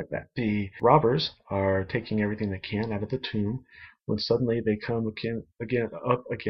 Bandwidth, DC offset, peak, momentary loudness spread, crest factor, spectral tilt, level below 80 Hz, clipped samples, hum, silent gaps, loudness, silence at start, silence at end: 6.2 kHz; under 0.1%; -4 dBFS; 11 LU; 22 dB; -8 dB/octave; -56 dBFS; under 0.1%; none; none; -28 LUFS; 0 s; 0 s